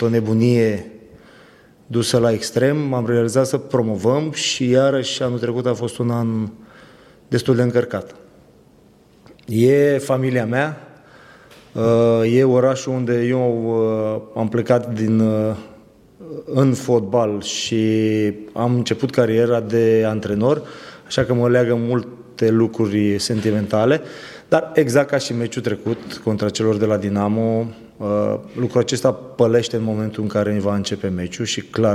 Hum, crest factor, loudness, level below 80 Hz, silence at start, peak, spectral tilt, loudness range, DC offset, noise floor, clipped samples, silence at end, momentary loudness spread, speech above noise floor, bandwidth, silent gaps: none; 18 dB; -19 LUFS; -56 dBFS; 0 s; 0 dBFS; -6 dB/octave; 3 LU; under 0.1%; -51 dBFS; under 0.1%; 0 s; 8 LU; 33 dB; 14.5 kHz; none